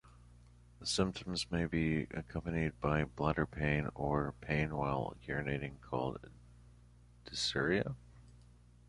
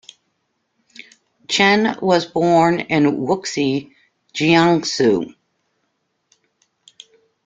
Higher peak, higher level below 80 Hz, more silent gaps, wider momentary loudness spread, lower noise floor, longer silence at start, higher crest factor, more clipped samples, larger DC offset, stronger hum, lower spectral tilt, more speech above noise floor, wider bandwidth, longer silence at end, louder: second, -16 dBFS vs -2 dBFS; first, -52 dBFS vs -58 dBFS; neither; about the same, 8 LU vs 8 LU; second, -61 dBFS vs -70 dBFS; second, 0.05 s vs 1.5 s; about the same, 22 dB vs 18 dB; neither; neither; first, 60 Hz at -55 dBFS vs none; about the same, -5.5 dB/octave vs -5 dB/octave; second, 25 dB vs 54 dB; first, 11.5 kHz vs 9.2 kHz; second, 0.55 s vs 2.15 s; second, -37 LUFS vs -17 LUFS